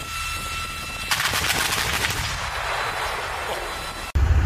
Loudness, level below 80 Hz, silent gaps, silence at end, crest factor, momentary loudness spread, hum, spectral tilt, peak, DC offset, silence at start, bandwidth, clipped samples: -24 LUFS; -30 dBFS; none; 0 s; 18 dB; 8 LU; none; -2.5 dB/octave; -6 dBFS; under 0.1%; 0 s; 15.5 kHz; under 0.1%